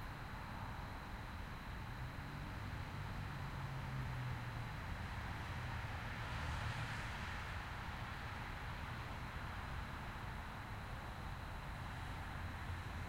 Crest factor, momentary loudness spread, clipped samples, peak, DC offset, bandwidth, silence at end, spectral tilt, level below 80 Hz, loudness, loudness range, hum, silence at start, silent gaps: 14 dB; 4 LU; under 0.1%; -32 dBFS; under 0.1%; 16 kHz; 0 s; -5.5 dB/octave; -52 dBFS; -47 LUFS; 3 LU; none; 0 s; none